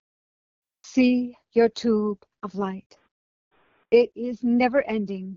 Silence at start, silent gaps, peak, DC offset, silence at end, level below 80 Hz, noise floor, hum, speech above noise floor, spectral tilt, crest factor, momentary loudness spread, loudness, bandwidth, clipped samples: 0.85 s; 2.86-2.90 s, 3.11-3.51 s; -6 dBFS; under 0.1%; 0 s; -64 dBFS; under -90 dBFS; none; over 67 dB; -6.5 dB/octave; 18 dB; 11 LU; -23 LUFS; 7.4 kHz; under 0.1%